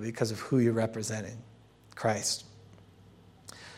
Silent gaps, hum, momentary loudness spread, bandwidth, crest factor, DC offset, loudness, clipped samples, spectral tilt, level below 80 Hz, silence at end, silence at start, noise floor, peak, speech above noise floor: none; none; 23 LU; 16 kHz; 18 dB; under 0.1%; -31 LUFS; under 0.1%; -4.5 dB/octave; -70 dBFS; 0 s; 0 s; -56 dBFS; -14 dBFS; 26 dB